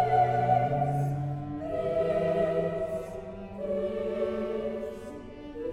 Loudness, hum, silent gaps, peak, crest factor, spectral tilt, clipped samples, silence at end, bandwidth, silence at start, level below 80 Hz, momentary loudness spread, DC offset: -30 LUFS; none; none; -14 dBFS; 16 dB; -8.5 dB/octave; under 0.1%; 0 s; 12.5 kHz; 0 s; -52 dBFS; 15 LU; under 0.1%